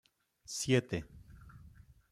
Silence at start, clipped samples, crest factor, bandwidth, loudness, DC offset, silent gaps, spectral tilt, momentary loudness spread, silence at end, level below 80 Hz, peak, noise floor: 0.5 s; under 0.1%; 24 dB; 15 kHz; -35 LUFS; under 0.1%; none; -4.5 dB/octave; 25 LU; 0.4 s; -60 dBFS; -14 dBFS; -58 dBFS